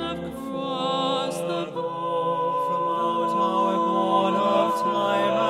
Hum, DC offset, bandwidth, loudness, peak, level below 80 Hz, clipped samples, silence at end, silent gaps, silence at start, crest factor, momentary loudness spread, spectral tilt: none; under 0.1%; 14.5 kHz; -24 LUFS; -8 dBFS; -60 dBFS; under 0.1%; 0 s; none; 0 s; 14 dB; 8 LU; -5.5 dB/octave